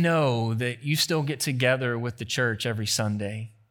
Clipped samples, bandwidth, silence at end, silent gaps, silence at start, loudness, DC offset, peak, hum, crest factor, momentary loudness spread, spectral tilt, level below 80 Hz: under 0.1%; 19 kHz; 0.2 s; none; 0 s; -26 LUFS; under 0.1%; -8 dBFS; none; 18 dB; 7 LU; -4.5 dB/octave; -68 dBFS